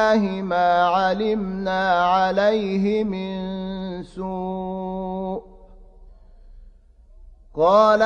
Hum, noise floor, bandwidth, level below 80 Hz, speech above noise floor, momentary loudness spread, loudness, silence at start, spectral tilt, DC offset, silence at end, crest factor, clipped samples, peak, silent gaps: none; -49 dBFS; 8.8 kHz; -48 dBFS; 29 dB; 13 LU; -21 LUFS; 0 s; -6.5 dB/octave; under 0.1%; 0 s; 18 dB; under 0.1%; -4 dBFS; none